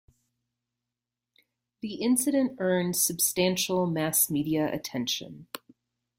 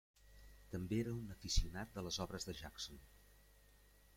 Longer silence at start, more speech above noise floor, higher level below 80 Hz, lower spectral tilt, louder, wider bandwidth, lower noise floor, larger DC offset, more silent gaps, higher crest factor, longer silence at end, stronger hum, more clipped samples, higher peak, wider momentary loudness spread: first, 1.85 s vs 0.25 s; first, 61 dB vs 25 dB; second, -68 dBFS vs -50 dBFS; about the same, -3.5 dB/octave vs -4 dB/octave; first, -26 LUFS vs -45 LUFS; about the same, 16.5 kHz vs 16.5 kHz; first, -88 dBFS vs -68 dBFS; neither; neither; about the same, 20 dB vs 22 dB; about the same, 0.6 s vs 0.6 s; second, none vs 50 Hz at -65 dBFS; neither; first, -10 dBFS vs -24 dBFS; second, 17 LU vs 21 LU